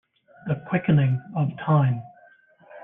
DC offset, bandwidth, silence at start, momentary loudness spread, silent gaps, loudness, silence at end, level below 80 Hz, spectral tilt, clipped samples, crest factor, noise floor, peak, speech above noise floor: under 0.1%; 3.7 kHz; 0.45 s; 10 LU; none; -24 LUFS; 0.05 s; -60 dBFS; -11.5 dB/octave; under 0.1%; 16 dB; -55 dBFS; -8 dBFS; 33 dB